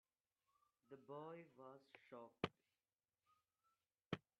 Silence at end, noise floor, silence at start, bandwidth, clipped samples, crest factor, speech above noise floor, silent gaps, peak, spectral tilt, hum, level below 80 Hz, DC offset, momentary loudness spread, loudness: 0.2 s; under -90 dBFS; 0.9 s; 6.2 kHz; under 0.1%; 32 dB; over 36 dB; 4.06-4.10 s; -26 dBFS; -4 dB/octave; none; -84 dBFS; under 0.1%; 15 LU; -55 LUFS